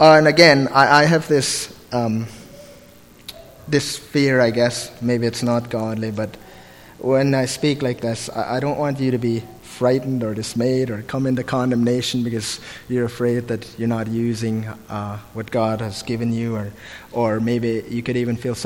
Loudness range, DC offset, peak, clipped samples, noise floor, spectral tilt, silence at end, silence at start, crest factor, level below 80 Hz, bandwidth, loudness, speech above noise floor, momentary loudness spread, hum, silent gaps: 4 LU; under 0.1%; 0 dBFS; under 0.1%; -46 dBFS; -5 dB/octave; 0 s; 0 s; 20 dB; -52 dBFS; 17 kHz; -20 LUFS; 27 dB; 15 LU; none; none